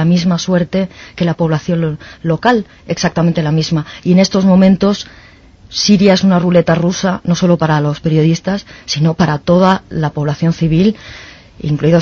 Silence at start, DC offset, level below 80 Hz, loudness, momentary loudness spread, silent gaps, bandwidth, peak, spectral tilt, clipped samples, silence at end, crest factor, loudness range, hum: 0 s; under 0.1%; -40 dBFS; -13 LUFS; 11 LU; none; 7 kHz; 0 dBFS; -6.5 dB/octave; under 0.1%; 0 s; 12 dB; 4 LU; none